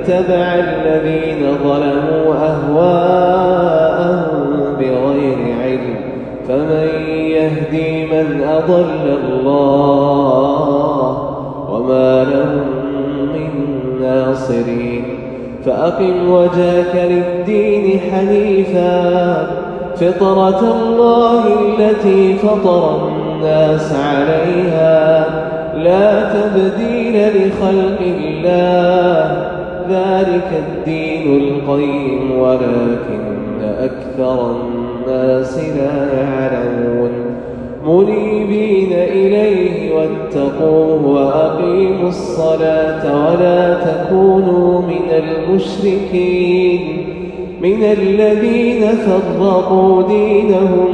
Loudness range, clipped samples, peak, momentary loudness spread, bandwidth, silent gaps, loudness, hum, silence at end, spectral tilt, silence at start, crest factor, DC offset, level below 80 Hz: 4 LU; under 0.1%; 0 dBFS; 8 LU; 8.8 kHz; none; -13 LUFS; none; 0 s; -8 dB/octave; 0 s; 12 dB; under 0.1%; -40 dBFS